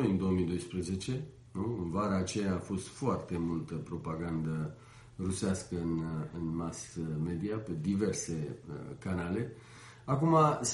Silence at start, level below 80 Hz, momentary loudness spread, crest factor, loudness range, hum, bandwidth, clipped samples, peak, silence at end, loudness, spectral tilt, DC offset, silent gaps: 0 s; -56 dBFS; 11 LU; 22 dB; 3 LU; none; 11.5 kHz; under 0.1%; -12 dBFS; 0 s; -35 LUFS; -6 dB/octave; under 0.1%; none